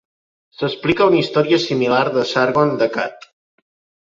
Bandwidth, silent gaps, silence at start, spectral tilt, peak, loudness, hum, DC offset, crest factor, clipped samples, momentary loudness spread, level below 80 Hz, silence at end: 7.6 kHz; none; 0.6 s; -6 dB/octave; -2 dBFS; -17 LUFS; none; under 0.1%; 16 dB; under 0.1%; 10 LU; -56 dBFS; 0.9 s